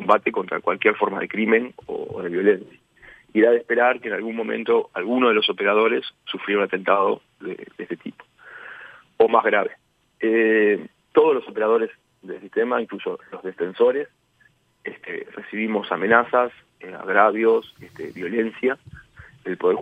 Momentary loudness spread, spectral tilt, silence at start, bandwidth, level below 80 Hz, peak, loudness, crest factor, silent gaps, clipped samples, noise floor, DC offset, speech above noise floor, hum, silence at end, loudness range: 17 LU; -7 dB/octave; 0 s; 4.9 kHz; -66 dBFS; 0 dBFS; -21 LUFS; 22 dB; none; under 0.1%; -60 dBFS; under 0.1%; 39 dB; none; 0 s; 5 LU